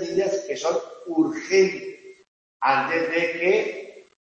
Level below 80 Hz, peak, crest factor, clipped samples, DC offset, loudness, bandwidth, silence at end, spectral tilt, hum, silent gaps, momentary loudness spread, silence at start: -70 dBFS; -4 dBFS; 20 dB; under 0.1%; under 0.1%; -23 LUFS; 8 kHz; 0.25 s; -4 dB/octave; none; 2.28-2.60 s; 13 LU; 0 s